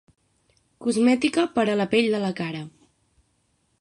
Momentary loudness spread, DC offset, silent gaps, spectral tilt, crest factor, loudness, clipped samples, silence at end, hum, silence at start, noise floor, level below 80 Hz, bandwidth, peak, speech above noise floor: 12 LU; under 0.1%; none; -5 dB/octave; 18 dB; -23 LUFS; under 0.1%; 1.1 s; none; 0.8 s; -69 dBFS; -66 dBFS; 11.5 kHz; -8 dBFS; 47 dB